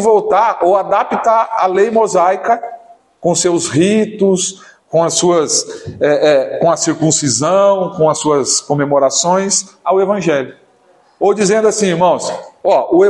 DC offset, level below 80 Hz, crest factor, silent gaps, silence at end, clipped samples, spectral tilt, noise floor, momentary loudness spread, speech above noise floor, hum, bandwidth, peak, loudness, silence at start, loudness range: under 0.1%; -58 dBFS; 12 dB; none; 0 s; under 0.1%; -4 dB/octave; -51 dBFS; 6 LU; 38 dB; none; 11.5 kHz; 0 dBFS; -13 LUFS; 0 s; 2 LU